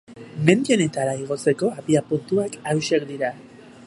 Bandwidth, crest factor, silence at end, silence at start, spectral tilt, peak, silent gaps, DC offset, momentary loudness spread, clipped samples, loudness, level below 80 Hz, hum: 11.5 kHz; 22 dB; 0 s; 0.1 s; -5.5 dB/octave; 0 dBFS; none; under 0.1%; 9 LU; under 0.1%; -22 LUFS; -64 dBFS; none